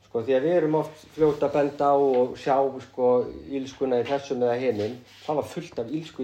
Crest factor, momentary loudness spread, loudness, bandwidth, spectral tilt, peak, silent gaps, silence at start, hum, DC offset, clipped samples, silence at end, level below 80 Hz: 16 dB; 11 LU; -25 LUFS; 9.2 kHz; -7 dB/octave; -10 dBFS; none; 0.15 s; none; under 0.1%; under 0.1%; 0 s; -60 dBFS